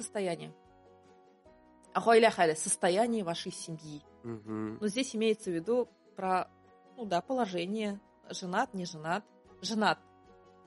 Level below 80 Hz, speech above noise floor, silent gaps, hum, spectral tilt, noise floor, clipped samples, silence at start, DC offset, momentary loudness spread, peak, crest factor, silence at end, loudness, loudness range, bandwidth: -74 dBFS; 29 dB; none; none; -4 dB/octave; -61 dBFS; under 0.1%; 0 s; under 0.1%; 17 LU; -12 dBFS; 22 dB; 0.7 s; -32 LUFS; 5 LU; 11.5 kHz